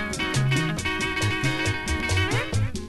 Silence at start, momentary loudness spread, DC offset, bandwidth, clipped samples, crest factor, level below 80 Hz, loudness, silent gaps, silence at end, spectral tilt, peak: 0 s; 3 LU; under 0.1%; 12.5 kHz; under 0.1%; 14 dB; -36 dBFS; -24 LUFS; none; 0 s; -4.5 dB/octave; -12 dBFS